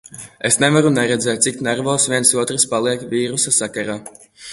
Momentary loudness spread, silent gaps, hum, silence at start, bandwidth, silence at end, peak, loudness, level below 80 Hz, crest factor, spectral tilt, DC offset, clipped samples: 11 LU; none; none; 0.1 s; 12 kHz; 0 s; 0 dBFS; -16 LUFS; -58 dBFS; 18 dB; -3 dB/octave; under 0.1%; under 0.1%